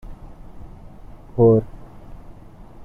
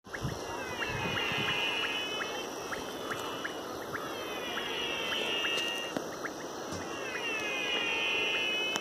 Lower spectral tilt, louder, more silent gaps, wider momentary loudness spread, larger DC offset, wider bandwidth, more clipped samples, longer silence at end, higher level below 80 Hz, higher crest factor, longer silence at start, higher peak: first, -12 dB/octave vs -2.5 dB/octave; first, -18 LUFS vs -33 LUFS; neither; first, 28 LU vs 9 LU; neither; second, 3.1 kHz vs 15.5 kHz; neither; first, 0.7 s vs 0 s; first, -42 dBFS vs -62 dBFS; about the same, 18 dB vs 22 dB; about the same, 0.1 s vs 0.05 s; first, -4 dBFS vs -12 dBFS